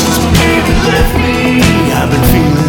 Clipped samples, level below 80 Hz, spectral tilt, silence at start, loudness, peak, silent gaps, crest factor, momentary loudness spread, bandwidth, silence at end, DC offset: under 0.1%; -18 dBFS; -5 dB/octave; 0 s; -9 LUFS; 0 dBFS; none; 8 dB; 2 LU; 19.5 kHz; 0 s; under 0.1%